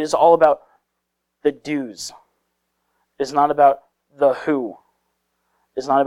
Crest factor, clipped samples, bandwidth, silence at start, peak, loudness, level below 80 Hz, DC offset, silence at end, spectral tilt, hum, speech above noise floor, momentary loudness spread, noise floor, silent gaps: 18 dB; under 0.1%; 13 kHz; 0 s; -2 dBFS; -19 LUFS; -62 dBFS; under 0.1%; 0 s; -5 dB/octave; none; 59 dB; 17 LU; -76 dBFS; none